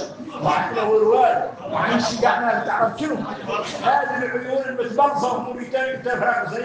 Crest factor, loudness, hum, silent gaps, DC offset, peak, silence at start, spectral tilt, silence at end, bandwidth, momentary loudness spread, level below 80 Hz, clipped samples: 16 dB; -21 LUFS; none; none; under 0.1%; -4 dBFS; 0 s; -4.5 dB/octave; 0 s; 9.4 kHz; 9 LU; -60 dBFS; under 0.1%